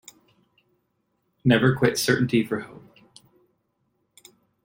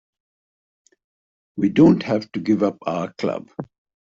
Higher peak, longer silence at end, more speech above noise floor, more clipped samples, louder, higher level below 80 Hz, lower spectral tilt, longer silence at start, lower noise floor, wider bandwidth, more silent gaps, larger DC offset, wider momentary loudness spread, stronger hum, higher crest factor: about the same, -4 dBFS vs -4 dBFS; first, 1.85 s vs 0.45 s; second, 52 dB vs over 71 dB; neither; about the same, -22 LUFS vs -20 LUFS; about the same, -60 dBFS vs -58 dBFS; second, -5.5 dB/octave vs -7 dB/octave; about the same, 1.45 s vs 1.55 s; second, -73 dBFS vs under -90 dBFS; first, 16.5 kHz vs 7.4 kHz; neither; neither; second, 12 LU vs 21 LU; neither; about the same, 22 dB vs 18 dB